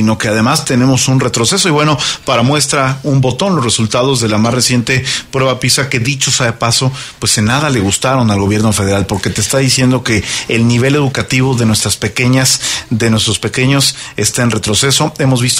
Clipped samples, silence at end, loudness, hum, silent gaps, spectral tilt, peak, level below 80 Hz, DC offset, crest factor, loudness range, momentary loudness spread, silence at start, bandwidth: under 0.1%; 0 s; -11 LUFS; none; none; -4 dB/octave; 0 dBFS; -38 dBFS; under 0.1%; 12 dB; 1 LU; 4 LU; 0 s; 16 kHz